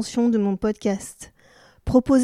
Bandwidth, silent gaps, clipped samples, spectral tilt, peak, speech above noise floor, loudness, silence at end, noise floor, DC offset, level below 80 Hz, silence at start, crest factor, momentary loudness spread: 14 kHz; none; under 0.1%; -6.5 dB/octave; -4 dBFS; 33 dB; -22 LUFS; 0 s; -54 dBFS; under 0.1%; -44 dBFS; 0 s; 18 dB; 20 LU